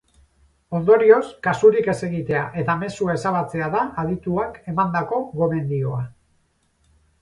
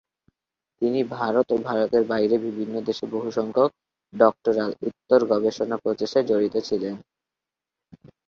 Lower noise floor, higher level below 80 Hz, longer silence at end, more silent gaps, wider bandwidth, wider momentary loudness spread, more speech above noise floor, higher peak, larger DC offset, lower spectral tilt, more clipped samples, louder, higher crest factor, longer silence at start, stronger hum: second, -64 dBFS vs -88 dBFS; first, -52 dBFS vs -66 dBFS; first, 1.1 s vs 0.2 s; neither; first, 11 kHz vs 7.2 kHz; about the same, 10 LU vs 8 LU; second, 44 dB vs 65 dB; about the same, -2 dBFS vs -4 dBFS; neither; about the same, -7.5 dB/octave vs -6.5 dB/octave; neither; about the same, -21 LUFS vs -23 LUFS; about the same, 20 dB vs 20 dB; about the same, 0.7 s vs 0.8 s; neither